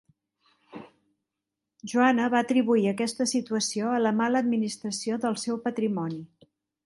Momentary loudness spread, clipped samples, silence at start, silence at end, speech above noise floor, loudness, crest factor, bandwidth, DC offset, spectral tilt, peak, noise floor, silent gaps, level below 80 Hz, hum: 13 LU; under 0.1%; 0.75 s; 0.6 s; 61 dB; -26 LUFS; 20 dB; 11.5 kHz; under 0.1%; -4.5 dB/octave; -8 dBFS; -86 dBFS; none; -74 dBFS; none